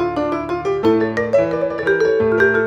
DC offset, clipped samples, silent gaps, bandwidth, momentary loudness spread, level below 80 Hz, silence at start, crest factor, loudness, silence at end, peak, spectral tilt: under 0.1%; under 0.1%; none; 7.8 kHz; 6 LU; -46 dBFS; 0 s; 14 dB; -17 LUFS; 0 s; -2 dBFS; -7 dB/octave